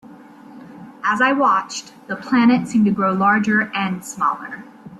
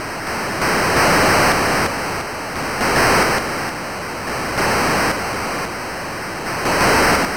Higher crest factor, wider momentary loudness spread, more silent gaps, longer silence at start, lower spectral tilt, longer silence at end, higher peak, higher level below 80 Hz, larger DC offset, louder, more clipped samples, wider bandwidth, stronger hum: about the same, 16 dB vs 12 dB; first, 15 LU vs 12 LU; neither; about the same, 0.05 s vs 0 s; first, -5 dB/octave vs -3.5 dB/octave; about the same, 0 s vs 0 s; about the same, -4 dBFS vs -6 dBFS; second, -62 dBFS vs -38 dBFS; second, under 0.1% vs 0.8%; about the same, -18 LUFS vs -18 LUFS; neither; second, 12.5 kHz vs over 20 kHz; neither